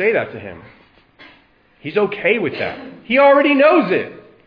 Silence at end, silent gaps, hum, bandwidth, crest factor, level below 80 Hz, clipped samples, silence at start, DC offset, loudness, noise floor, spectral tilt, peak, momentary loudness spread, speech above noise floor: 0.3 s; none; none; 5.2 kHz; 16 dB; -60 dBFS; under 0.1%; 0 s; under 0.1%; -15 LUFS; -52 dBFS; -8 dB/octave; -2 dBFS; 22 LU; 37 dB